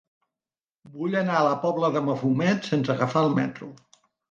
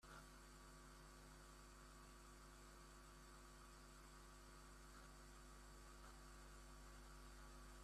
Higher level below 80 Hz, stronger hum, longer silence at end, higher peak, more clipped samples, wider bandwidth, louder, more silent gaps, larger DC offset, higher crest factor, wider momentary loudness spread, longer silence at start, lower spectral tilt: about the same, -70 dBFS vs -66 dBFS; neither; first, 0.55 s vs 0 s; first, -8 dBFS vs -48 dBFS; neither; second, 7.6 kHz vs 14.5 kHz; first, -24 LUFS vs -63 LUFS; neither; neither; about the same, 18 dB vs 14 dB; first, 9 LU vs 1 LU; first, 0.85 s vs 0 s; first, -7 dB/octave vs -3.5 dB/octave